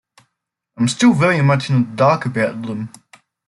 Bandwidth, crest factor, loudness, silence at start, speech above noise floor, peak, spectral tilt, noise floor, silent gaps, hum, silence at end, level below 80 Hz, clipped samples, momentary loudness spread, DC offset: 11.5 kHz; 16 dB; -16 LUFS; 0.8 s; 61 dB; -2 dBFS; -6 dB/octave; -77 dBFS; none; none; 0.6 s; -58 dBFS; under 0.1%; 13 LU; under 0.1%